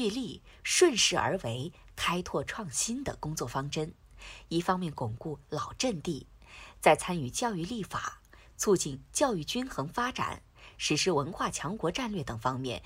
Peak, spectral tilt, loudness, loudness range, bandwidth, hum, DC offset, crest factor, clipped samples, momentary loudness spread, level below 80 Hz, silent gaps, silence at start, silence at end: -8 dBFS; -3.5 dB/octave; -31 LUFS; 5 LU; 16 kHz; none; under 0.1%; 24 dB; under 0.1%; 15 LU; -54 dBFS; none; 0 s; 0 s